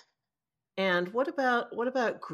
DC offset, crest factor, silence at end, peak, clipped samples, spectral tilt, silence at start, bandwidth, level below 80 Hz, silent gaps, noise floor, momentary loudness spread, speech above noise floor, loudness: under 0.1%; 16 dB; 0 s; -16 dBFS; under 0.1%; -5.5 dB/octave; 0.75 s; 14 kHz; -82 dBFS; none; under -90 dBFS; 4 LU; over 61 dB; -29 LUFS